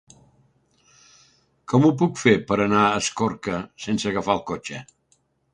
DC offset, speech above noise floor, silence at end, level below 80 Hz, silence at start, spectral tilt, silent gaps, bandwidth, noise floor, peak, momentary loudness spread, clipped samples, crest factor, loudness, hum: under 0.1%; 44 dB; 0.7 s; -56 dBFS; 1.7 s; -5.5 dB/octave; none; 11 kHz; -66 dBFS; -2 dBFS; 12 LU; under 0.1%; 22 dB; -22 LUFS; none